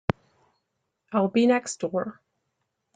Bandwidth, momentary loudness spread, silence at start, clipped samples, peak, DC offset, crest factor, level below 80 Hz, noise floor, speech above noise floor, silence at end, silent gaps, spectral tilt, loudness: 9.4 kHz; 13 LU; 1.1 s; under 0.1%; -2 dBFS; under 0.1%; 26 dB; -62 dBFS; -79 dBFS; 55 dB; 0.85 s; none; -5.5 dB/octave; -25 LUFS